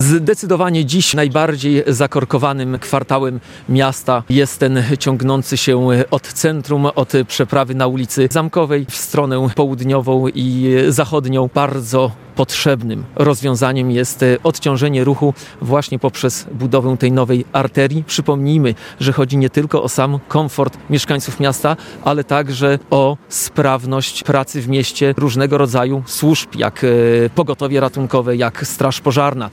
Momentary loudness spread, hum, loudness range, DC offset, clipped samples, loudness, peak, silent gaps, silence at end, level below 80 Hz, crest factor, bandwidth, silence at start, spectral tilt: 5 LU; none; 1 LU; under 0.1%; under 0.1%; -15 LUFS; 0 dBFS; none; 0 s; -50 dBFS; 14 dB; 17 kHz; 0 s; -5.5 dB/octave